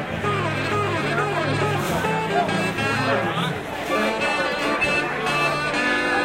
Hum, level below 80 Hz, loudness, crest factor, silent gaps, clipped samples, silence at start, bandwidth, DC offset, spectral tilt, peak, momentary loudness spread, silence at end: none; -48 dBFS; -22 LUFS; 14 dB; none; under 0.1%; 0 s; 16 kHz; under 0.1%; -5 dB/octave; -8 dBFS; 3 LU; 0 s